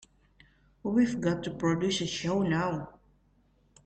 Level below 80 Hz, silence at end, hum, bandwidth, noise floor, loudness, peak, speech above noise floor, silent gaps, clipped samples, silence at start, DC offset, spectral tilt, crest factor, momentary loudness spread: -60 dBFS; 0.95 s; none; 9 kHz; -66 dBFS; -30 LUFS; -14 dBFS; 38 dB; none; under 0.1%; 0.85 s; under 0.1%; -5.5 dB/octave; 18 dB; 10 LU